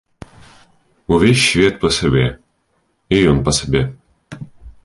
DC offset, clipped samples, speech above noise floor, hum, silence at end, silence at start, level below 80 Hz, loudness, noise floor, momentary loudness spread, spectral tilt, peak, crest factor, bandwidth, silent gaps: under 0.1%; under 0.1%; 50 dB; none; 0.15 s; 1.1 s; -34 dBFS; -15 LUFS; -64 dBFS; 23 LU; -5 dB/octave; -2 dBFS; 16 dB; 11.5 kHz; none